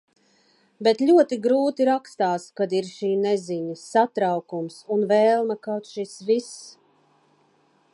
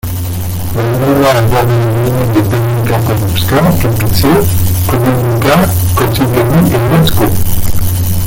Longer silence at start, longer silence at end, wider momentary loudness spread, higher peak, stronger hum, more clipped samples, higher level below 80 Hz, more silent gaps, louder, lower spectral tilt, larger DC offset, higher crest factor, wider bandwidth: first, 0.8 s vs 0.05 s; first, 1.25 s vs 0 s; first, 12 LU vs 6 LU; second, -6 dBFS vs 0 dBFS; neither; neither; second, -80 dBFS vs -24 dBFS; neither; second, -23 LUFS vs -11 LUFS; about the same, -5.5 dB/octave vs -6 dB/octave; neither; first, 18 dB vs 10 dB; second, 11.5 kHz vs 17 kHz